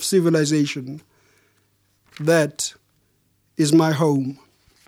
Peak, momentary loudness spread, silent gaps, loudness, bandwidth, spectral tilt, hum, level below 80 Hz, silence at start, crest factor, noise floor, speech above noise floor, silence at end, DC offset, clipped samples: -4 dBFS; 16 LU; none; -20 LUFS; 16.5 kHz; -5 dB/octave; none; -68 dBFS; 0 s; 18 dB; -65 dBFS; 46 dB; 0.5 s; under 0.1%; under 0.1%